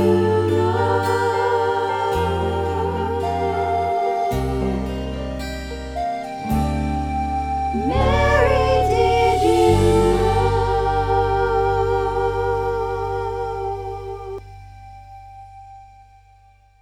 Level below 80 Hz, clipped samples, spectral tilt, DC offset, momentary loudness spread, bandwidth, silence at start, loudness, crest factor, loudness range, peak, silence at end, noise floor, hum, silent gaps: -30 dBFS; under 0.1%; -6.5 dB/octave; under 0.1%; 12 LU; 16.5 kHz; 0 s; -20 LUFS; 16 dB; 10 LU; -4 dBFS; 0.95 s; -52 dBFS; 50 Hz at -55 dBFS; none